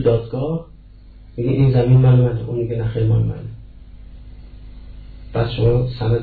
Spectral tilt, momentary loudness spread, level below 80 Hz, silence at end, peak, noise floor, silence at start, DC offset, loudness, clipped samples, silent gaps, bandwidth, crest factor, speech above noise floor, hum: -12 dB/octave; 14 LU; -34 dBFS; 0 s; -4 dBFS; -41 dBFS; 0 s; under 0.1%; -18 LUFS; under 0.1%; none; 4.7 kHz; 14 dB; 25 dB; none